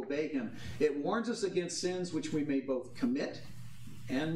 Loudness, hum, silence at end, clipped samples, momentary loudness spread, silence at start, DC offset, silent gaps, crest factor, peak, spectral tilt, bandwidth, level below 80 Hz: -35 LUFS; none; 0 s; under 0.1%; 15 LU; 0 s; 0.3%; none; 16 dB; -18 dBFS; -5 dB/octave; 14 kHz; -64 dBFS